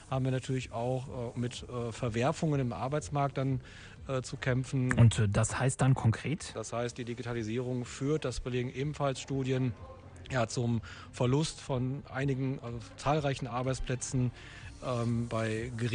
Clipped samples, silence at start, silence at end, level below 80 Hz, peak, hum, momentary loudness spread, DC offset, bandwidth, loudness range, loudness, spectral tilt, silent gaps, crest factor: under 0.1%; 0 s; 0 s; -52 dBFS; -12 dBFS; none; 9 LU; under 0.1%; 10 kHz; 5 LU; -33 LUFS; -6 dB/octave; none; 20 dB